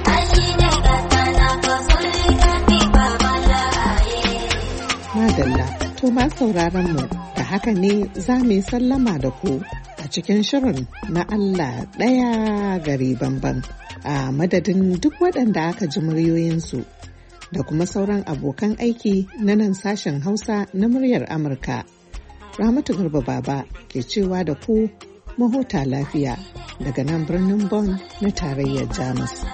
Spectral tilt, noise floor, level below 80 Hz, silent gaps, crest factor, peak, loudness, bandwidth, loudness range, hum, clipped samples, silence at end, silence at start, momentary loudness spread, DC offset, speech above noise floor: -5.5 dB/octave; -40 dBFS; -26 dBFS; none; 18 dB; -2 dBFS; -20 LUFS; 8.8 kHz; 6 LU; none; under 0.1%; 0 s; 0 s; 10 LU; under 0.1%; 20 dB